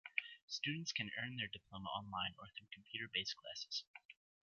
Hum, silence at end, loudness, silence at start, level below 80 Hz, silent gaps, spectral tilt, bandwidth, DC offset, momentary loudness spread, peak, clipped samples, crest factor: none; 0.3 s; -44 LUFS; 0.05 s; -76 dBFS; 0.42-0.48 s, 3.87-3.94 s, 4.05-4.09 s; -1 dB/octave; 7.6 kHz; under 0.1%; 13 LU; -20 dBFS; under 0.1%; 26 dB